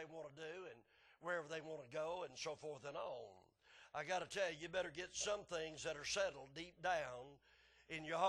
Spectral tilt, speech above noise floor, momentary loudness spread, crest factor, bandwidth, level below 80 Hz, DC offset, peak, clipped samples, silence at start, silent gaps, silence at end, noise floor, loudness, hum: -2.5 dB/octave; 24 dB; 12 LU; 22 dB; 11.5 kHz; -76 dBFS; under 0.1%; -26 dBFS; under 0.1%; 0 s; none; 0 s; -70 dBFS; -46 LUFS; none